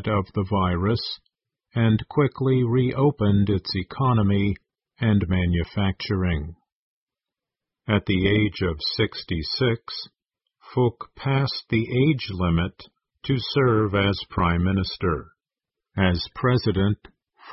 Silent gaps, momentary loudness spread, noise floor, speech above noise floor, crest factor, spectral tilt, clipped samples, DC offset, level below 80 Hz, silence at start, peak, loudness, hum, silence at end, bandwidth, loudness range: 6.72-7.07 s; 10 LU; -89 dBFS; 66 dB; 16 dB; -10 dB/octave; under 0.1%; under 0.1%; -38 dBFS; 0 s; -6 dBFS; -23 LUFS; none; 0 s; 5.8 kHz; 4 LU